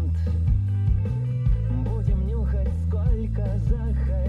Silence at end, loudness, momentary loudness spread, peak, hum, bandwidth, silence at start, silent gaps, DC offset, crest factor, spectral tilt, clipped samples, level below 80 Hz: 0 s; -25 LUFS; 2 LU; -10 dBFS; none; 4.3 kHz; 0 s; none; under 0.1%; 12 dB; -10.5 dB/octave; under 0.1%; -26 dBFS